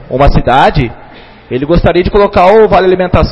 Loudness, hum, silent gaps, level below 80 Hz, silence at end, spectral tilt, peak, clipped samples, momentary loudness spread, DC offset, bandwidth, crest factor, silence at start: -8 LUFS; none; none; -18 dBFS; 0 s; -8 dB/octave; 0 dBFS; 2%; 11 LU; under 0.1%; 8.6 kHz; 8 dB; 0 s